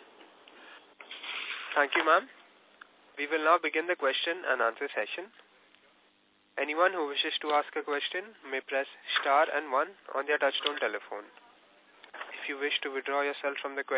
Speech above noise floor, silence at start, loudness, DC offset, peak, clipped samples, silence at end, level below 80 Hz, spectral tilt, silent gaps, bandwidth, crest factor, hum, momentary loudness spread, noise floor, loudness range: 37 dB; 0 s; -30 LUFS; under 0.1%; -10 dBFS; under 0.1%; 0 s; under -90 dBFS; 3 dB/octave; none; 4 kHz; 22 dB; none; 17 LU; -67 dBFS; 4 LU